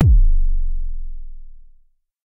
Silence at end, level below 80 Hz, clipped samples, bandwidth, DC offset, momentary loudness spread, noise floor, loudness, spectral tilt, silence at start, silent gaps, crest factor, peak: 0.7 s; -16 dBFS; under 0.1%; 0.8 kHz; under 0.1%; 23 LU; -54 dBFS; -22 LUFS; -10.5 dB/octave; 0 s; none; 14 dB; -2 dBFS